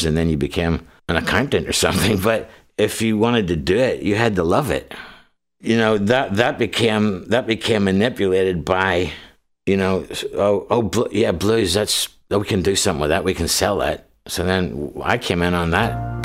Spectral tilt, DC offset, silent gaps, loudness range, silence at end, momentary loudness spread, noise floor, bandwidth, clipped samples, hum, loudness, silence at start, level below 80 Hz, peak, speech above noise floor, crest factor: -4.5 dB/octave; under 0.1%; none; 2 LU; 0 s; 7 LU; -51 dBFS; 16 kHz; under 0.1%; none; -19 LUFS; 0 s; -38 dBFS; -2 dBFS; 33 dB; 18 dB